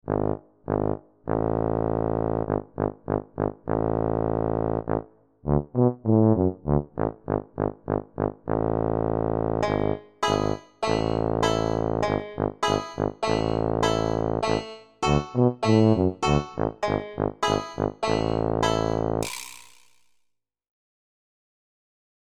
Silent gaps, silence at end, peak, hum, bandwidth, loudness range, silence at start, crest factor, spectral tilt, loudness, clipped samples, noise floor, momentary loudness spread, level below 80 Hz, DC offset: none; 2.05 s; -6 dBFS; none; 14 kHz; 4 LU; 0.05 s; 20 dB; -6.5 dB/octave; -26 LUFS; under 0.1%; -74 dBFS; 8 LU; -42 dBFS; 0.3%